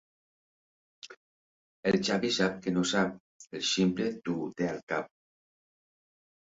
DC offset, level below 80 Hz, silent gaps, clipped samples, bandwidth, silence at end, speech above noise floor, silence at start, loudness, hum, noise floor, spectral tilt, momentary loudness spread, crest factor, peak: under 0.1%; -68 dBFS; 1.17-1.83 s, 3.20-3.40 s, 4.83-4.87 s; under 0.1%; 8 kHz; 1.4 s; over 60 dB; 1.05 s; -30 LUFS; none; under -90 dBFS; -4.5 dB/octave; 22 LU; 20 dB; -14 dBFS